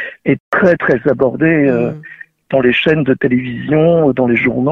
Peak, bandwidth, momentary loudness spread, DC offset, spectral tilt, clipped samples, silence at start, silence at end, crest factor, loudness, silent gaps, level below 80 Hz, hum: 0 dBFS; 6.4 kHz; 6 LU; under 0.1%; -8.5 dB/octave; under 0.1%; 0 s; 0 s; 12 dB; -13 LUFS; 0.40-0.52 s; -46 dBFS; none